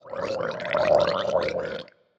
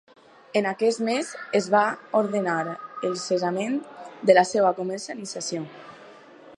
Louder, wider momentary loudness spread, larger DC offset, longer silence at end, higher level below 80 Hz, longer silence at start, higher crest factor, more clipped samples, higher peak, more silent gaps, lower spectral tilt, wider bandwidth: about the same, -25 LUFS vs -24 LUFS; second, 11 LU vs 14 LU; neither; first, 0.35 s vs 0 s; first, -58 dBFS vs -78 dBFS; second, 0.05 s vs 0.55 s; about the same, 18 dB vs 22 dB; neither; second, -8 dBFS vs -4 dBFS; neither; about the same, -5 dB/octave vs -4.5 dB/octave; second, 8 kHz vs 11 kHz